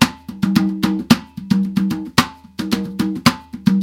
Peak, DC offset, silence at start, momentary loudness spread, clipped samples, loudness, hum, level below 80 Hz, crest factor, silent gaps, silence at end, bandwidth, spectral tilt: 0 dBFS; under 0.1%; 0 s; 6 LU; under 0.1%; -19 LUFS; none; -46 dBFS; 18 dB; none; 0 s; 17 kHz; -5 dB/octave